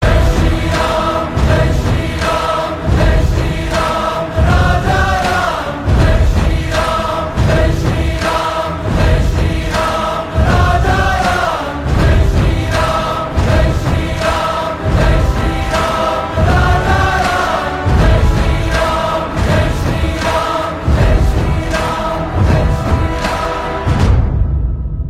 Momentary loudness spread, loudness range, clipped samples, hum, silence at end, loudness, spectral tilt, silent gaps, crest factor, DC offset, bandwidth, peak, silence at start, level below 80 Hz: 5 LU; 1 LU; under 0.1%; none; 0 s; -14 LUFS; -6 dB/octave; none; 12 dB; under 0.1%; 14.5 kHz; 0 dBFS; 0 s; -18 dBFS